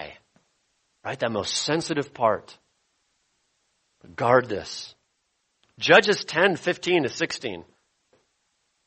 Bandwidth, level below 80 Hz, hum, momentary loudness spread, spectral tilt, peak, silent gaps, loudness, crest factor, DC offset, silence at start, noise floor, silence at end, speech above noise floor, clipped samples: 8.8 kHz; -66 dBFS; none; 20 LU; -3.5 dB/octave; -2 dBFS; none; -23 LUFS; 24 dB; under 0.1%; 0 s; -74 dBFS; 1.25 s; 50 dB; under 0.1%